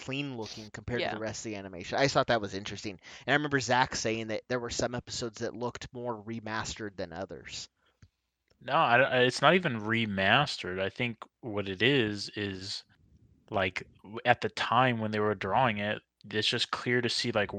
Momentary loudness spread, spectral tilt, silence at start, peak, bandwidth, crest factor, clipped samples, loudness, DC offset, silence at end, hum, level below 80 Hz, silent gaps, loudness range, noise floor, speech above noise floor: 15 LU; -4 dB/octave; 0 s; -6 dBFS; 10 kHz; 24 dB; under 0.1%; -30 LUFS; under 0.1%; 0 s; none; -60 dBFS; none; 9 LU; -74 dBFS; 44 dB